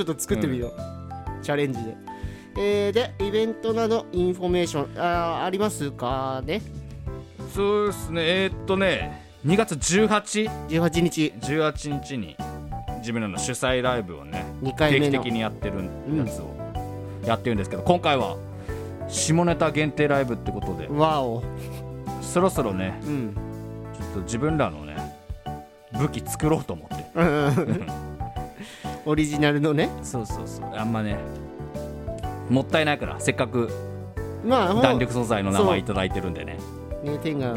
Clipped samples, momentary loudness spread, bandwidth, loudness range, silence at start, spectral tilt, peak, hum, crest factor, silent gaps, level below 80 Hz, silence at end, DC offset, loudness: under 0.1%; 14 LU; 17 kHz; 4 LU; 0 s; -5.5 dB/octave; -4 dBFS; none; 22 dB; none; -42 dBFS; 0 s; under 0.1%; -25 LUFS